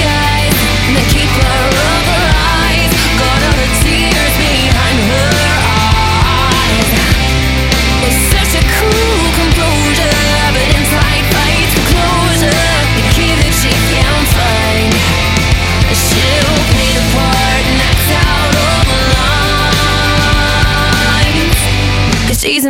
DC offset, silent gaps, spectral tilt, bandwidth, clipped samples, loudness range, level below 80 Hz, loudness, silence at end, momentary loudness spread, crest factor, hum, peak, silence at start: under 0.1%; none; -4 dB/octave; 17 kHz; under 0.1%; 0 LU; -16 dBFS; -10 LUFS; 0 s; 1 LU; 10 dB; none; 0 dBFS; 0 s